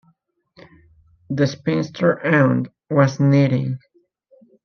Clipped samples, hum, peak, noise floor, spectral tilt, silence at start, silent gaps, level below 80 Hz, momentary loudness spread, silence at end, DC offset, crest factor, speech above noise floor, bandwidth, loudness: under 0.1%; none; -4 dBFS; -63 dBFS; -7.5 dB/octave; 1.3 s; none; -62 dBFS; 9 LU; 0.9 s; under 0.1%; 16 dB; 46 dB; 6.6 kHz; -19 LUFS